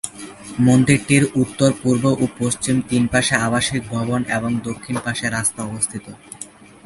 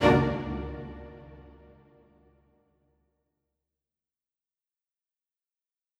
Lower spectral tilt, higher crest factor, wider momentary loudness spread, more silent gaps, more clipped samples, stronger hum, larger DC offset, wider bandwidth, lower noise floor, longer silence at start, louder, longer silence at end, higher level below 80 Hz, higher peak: second, -5 dB/octave vs -7.5 dB/octave; second, 18 dB vs 26 dB; second, 18 LU vs 26 LU; neither; neither; neither; neither; about the same, 12 kHz vs 12 kHz; second, -40 dBFS vs -90 dBFS; about the same, 0.05 s vs 0 s; first, -19 LUFS vs -29 LUFS; second, 0.4 s vs 4.5 s; about the same, -48 dBFS vs -48 dBFS; first, 0 dBFS vs -8 dBFS